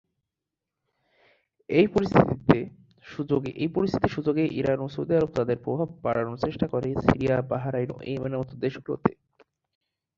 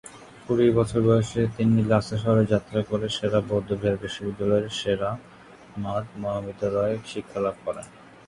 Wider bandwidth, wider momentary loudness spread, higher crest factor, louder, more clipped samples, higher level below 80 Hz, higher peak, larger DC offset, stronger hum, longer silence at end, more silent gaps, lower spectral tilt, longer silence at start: second, 7.6 kHz vs 11 kHz; second, 9 LU vs 13 LU; first, 24 dB vs 18 dB; about the same, -26 LUFS vs -25 LUFS; neither; about the same, -50 dBFS vs -50 dBFS; first, -2 dBFS vs -6 dBFS; neither; neither; first, 1.05 s vs 0.25 s; neither; first, -8.5 dB/octave vs -7 dB/octave; first, 1.7 s vs 0.05 s